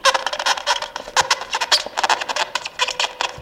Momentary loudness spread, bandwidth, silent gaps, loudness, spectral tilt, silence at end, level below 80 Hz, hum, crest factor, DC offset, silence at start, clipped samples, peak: 5 LU; 17 kHz; none; -19 LUFS; 1 dB/octave; 0 s; -56 dBFS; none; 20 dB; under 0.1%; 0.05 s; under 0.1%; 0 dBFS